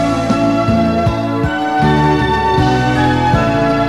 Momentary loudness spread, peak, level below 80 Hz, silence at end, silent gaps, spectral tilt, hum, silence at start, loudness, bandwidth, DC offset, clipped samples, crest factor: 4 LU; -2 dBFS; -30 dBFS; 0 s; none; -7 dB/octave; none; 0 s; -13 LUFS; 13 kHz; 0.5%; under 0.1%; 10 dB